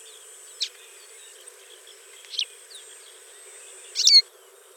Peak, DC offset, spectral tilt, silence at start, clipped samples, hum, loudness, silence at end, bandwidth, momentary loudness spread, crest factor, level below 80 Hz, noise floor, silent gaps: -4 dBFS; under 0.1%; 8 dB/octave; 0.6 s; under 0.1%; none; -20 LUFS; 0.55 s; over 20 kHz; 30 LU; 24 dB; under -90 dBFS; -51 dBFS; none